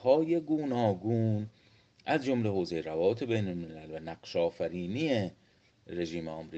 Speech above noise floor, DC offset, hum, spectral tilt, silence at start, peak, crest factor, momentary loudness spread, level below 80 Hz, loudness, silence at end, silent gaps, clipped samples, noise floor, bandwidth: 28 dB; under 0.1%; none; -7.5 dB/octave; 0 s; -12 dBFS; 20 dB; 13 LU; -66 dBFS; -32 LUFS; 0 s; none; under 0.1%; -59 dBFS; 8.2 kHz